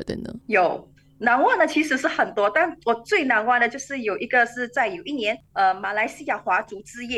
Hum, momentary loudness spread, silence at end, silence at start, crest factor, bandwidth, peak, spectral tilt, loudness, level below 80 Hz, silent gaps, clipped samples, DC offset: none; 9 LU; 0 s; 0 s; 16 dB; 12.5 kHz; -6 dBFS; -3.5 dB/octave; -22 LUFS; -58 dBFS; none; under 0.1%; under 0.1%